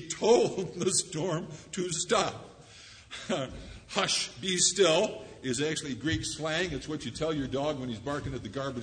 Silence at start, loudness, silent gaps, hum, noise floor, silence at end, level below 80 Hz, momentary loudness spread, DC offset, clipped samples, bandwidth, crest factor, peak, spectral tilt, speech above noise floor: 0 s; -30 LUFS; none; none; -52 dBFS; 0 s; -54 dBFS; 15 LU; under 0.1%; under 0.1%; 9.6 kHz; 20 dB; -10 dBFS; -3 dB/octave; 22 dB